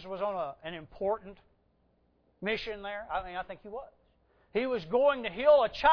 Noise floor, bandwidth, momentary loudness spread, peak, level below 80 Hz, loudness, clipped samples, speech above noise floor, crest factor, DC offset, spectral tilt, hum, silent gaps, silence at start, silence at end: -70 dBFS; 5.4 kHz; 18 LU; -12 dBFS; -58 dBFS; -30 LUFS; under 0.1%; 40 dB; 20 dB; under 0.1%; -6 dB/octave; none; none; 0 s; 0 s